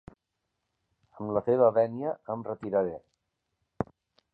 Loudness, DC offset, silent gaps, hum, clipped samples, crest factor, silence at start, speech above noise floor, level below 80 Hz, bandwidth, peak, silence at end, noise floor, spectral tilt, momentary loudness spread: -29 LUFS; under 0.1%; none; none; under 0.1%; 20 dB; 1.2 s; 55 dB; -62 dBFS; 4.5 kHz; -10 dBFS; 0.5 s; -83 dBFS; -10.5 dB/octave; 15 LU